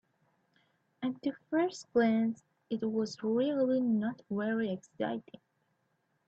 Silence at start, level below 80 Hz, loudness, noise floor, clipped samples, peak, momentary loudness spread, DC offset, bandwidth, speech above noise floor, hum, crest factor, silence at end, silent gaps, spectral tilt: 1 s; -78 dBFS; -33 LUFS; -77 dBFS; under 0.1%; -18 dBFS; 9 LU; under 0.1%; 8 kHz; 45 dB; none; 16 dB; 1.05 s; none; -6.5 dB/octave